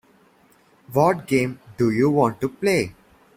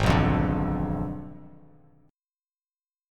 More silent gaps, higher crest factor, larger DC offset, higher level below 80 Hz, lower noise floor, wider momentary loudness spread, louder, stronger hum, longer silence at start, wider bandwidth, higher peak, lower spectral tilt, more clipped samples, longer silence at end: neither; about the same, 18 dB vs 22 dB; neither; second, -56 dBFS vs -38 dBFS; second, -57 dBFS vs under -90 dBFS; second, 7 LU vs 20 LU; first, -21 LUFS vs -26 LUFS; neither; first, 0.9 s vs 0 s; first, 16.5 kHz vs 13.5 kHz; about the same, -4 dBFS vs -6 dBFS; about the same, -6.5 dB/octave vs -7.5 dB/octave; neither; second, 0.45 s vs 1.6 s